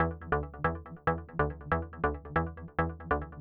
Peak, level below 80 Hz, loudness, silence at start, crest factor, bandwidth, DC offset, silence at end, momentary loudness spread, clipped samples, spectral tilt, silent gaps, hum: -14 dBFS; -44 dBFS; -33 LUFS; 0 s; 18 dB; 4.7 kHz; under 0.1%; 0 s; 3 LU; under 0.1%; -10.5 dB/octave; none; none